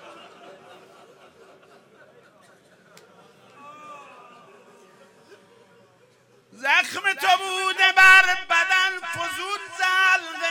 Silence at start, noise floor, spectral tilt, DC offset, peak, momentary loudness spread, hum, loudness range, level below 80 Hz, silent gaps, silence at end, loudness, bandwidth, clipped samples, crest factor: 0.05 s; -58 dBFS; 0 dB/octave; under 0.1%; -2 dBFS; 17 LU; none; 10 LU; -64 dBFS; none; 0 s; -18 LUFS; 17.5 kHz; under 0.1%; 22 dB